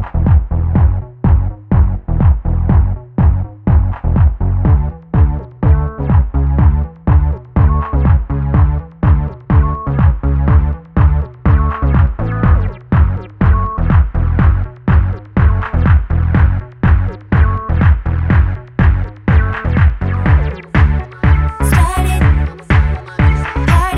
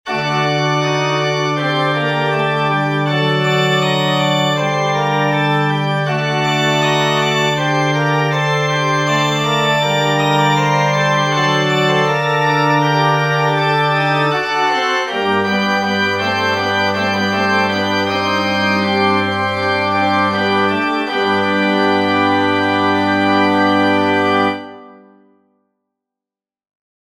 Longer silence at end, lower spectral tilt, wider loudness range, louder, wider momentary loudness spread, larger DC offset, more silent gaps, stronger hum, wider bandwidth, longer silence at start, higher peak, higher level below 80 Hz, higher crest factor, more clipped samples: second, 0 s vs 2.15 s; first, -8 dB/octave vs -5 dB/octave; about the same, 1 LU vs 2 LU; about the same, -14 LUFS vs -15 LUFS; about the same, 3 LU vs 3 LU; neither; neither; neither; second, 12 kHz vs 16 kHz; about the same, 0 s vs 0.05 s; about the same, 0 dBFS vs 0 dBFS; first, -14 dBFS vs -58 dBFS; about the same, 12 dB vs 14 dB; neither